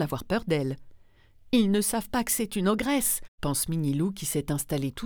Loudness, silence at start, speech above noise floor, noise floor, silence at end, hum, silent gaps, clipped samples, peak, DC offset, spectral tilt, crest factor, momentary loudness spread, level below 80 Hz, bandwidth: -27 LUFS; 0 s; 28 dB; -56 dBFS; 0 s; none; 3.28-3.38 s; under 0.1%; -10 dBFS; under 0.1%; -4.5 dB/octave; 18 dB; 6 LU; -48 dBFS; over 20 kHz